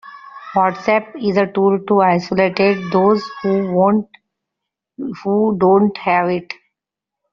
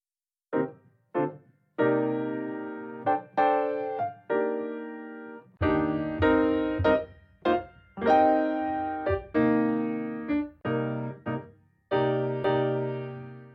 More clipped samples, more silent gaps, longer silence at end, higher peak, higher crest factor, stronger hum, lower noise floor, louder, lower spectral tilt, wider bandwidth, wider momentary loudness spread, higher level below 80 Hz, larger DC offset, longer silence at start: neither; neither; first, 0.8 s vs 0 s; first, -2 dBFS vs -10 dBFS; about the same, 14 dB vs 18 dB; neither; second, -84 dBFS vs under -90 dBFS; first, -16 LUFS vs -28 LUFS; second, -5.5 dB/octave vs -9 dB/octave; first, 6.8 kHz vs 5.8 kHz; about the same, 15 LU vs 13 LU; second, -58 dBFS vs -52 dBFS; neither; second, 0.05 s vs 0.5 s